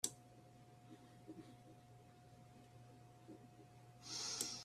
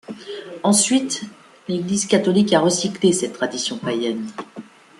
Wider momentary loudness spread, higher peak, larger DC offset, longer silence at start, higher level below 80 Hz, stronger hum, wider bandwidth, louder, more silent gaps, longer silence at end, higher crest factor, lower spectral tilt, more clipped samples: about the same, 20 LU vs 18 LU; second, -24 dBFS vs -2 dBFS; neither; about the same, 0.05 s vs 0.1 s; second, -82 dBFS vs -62 dBFS; neither; first, 14 kHz vs 12.5 kHz; second, -50 LUFS vs -19 LUFS; neither; second, 0 s vs 0.4 s; first, 30 dB vs 18 dB; second, -1.5 dB/octave vs -4 dB/octave; neither